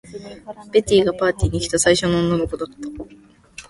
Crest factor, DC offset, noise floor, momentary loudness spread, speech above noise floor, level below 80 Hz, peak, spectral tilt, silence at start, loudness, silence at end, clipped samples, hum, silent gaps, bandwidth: 18 dB; under 0.1%; -49 dBFS; 21 LU; 29 dB; -36 dBFS; -2 dBFS; -4.5 dB/octave; 0.05 s; -19 LUFS; 0.05 s; under 0.1%; none; none; 11.5 kHz